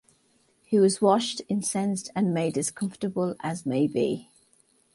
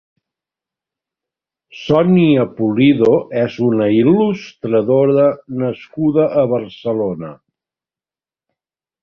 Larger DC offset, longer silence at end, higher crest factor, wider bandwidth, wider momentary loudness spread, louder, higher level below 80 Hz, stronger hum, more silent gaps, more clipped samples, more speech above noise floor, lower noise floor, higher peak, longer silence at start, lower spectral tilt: neither; second, 0.7 s vs 1.7 s; about the same, 18 dB vs 16 dB; first, 11.5 kHz vs 6.6 kHz; about the same, 8 LU vs 10 LU; second, -26 LUFS vs -15 LUFS; second, -68 dBFS vs -54 dBFS; neither; neither; neither; second, 40 dB vs over 76 dB; second, -66 dBFS vs under -90 dBFS; second, -8 dBFS vs -2 dBFS; second, 0.7 s vs 1.75 s; second, -5 dB/octave vs -9 dB/octave